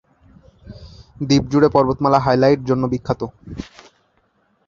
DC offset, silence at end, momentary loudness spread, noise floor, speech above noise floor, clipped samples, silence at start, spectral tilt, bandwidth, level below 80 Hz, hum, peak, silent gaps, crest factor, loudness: under 0.1%; 1.05 s; 19 LU; -62 dBFS; 45 dB; under 0.1%; 0.65 s; -7 dB/octave; 7.4 kHz; -44 dBFS; none; 0 dBFS; none; 18 dB; -17 LUFS